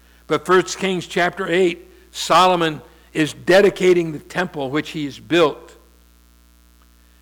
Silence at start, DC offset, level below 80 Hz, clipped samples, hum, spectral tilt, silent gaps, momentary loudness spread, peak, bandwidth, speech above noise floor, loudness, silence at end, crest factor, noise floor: 0.3 s; under 0.1%; -52 dBFS; under 0.1%; 60 Hz at -45 dBFS; -4.5 dB/octave; none; 14 LU; -6 dBFS; 19 kHz; 34 dB; -18 LUFS; 1.55 s; 14 dB; -51 dBFS